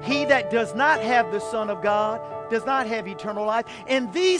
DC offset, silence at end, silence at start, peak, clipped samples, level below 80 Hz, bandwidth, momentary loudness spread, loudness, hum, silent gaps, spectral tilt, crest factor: under 0.1%; 0 s; 0 s; -6 dBFS; under 0.1%; -64 dBFS; 10.5 kHz; 8 LU; -23 LUFS; none; none; -4 dB/octave; 18 dB